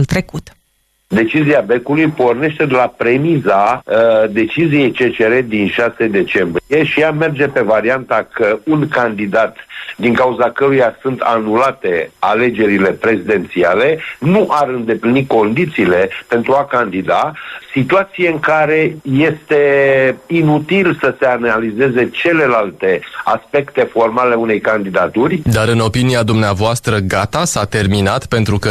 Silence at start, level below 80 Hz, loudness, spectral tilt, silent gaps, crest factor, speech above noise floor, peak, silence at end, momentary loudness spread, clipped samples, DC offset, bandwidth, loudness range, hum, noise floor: 0 s; -44 dBFS; -13 LUFS; -6 dB/octave; none; 12 dB; 47 dB; -2 dBFS; 0 s; 4 LU; under 0.1%; under 0.1%; 14 kHz; 2 LU; none; -60 dBFS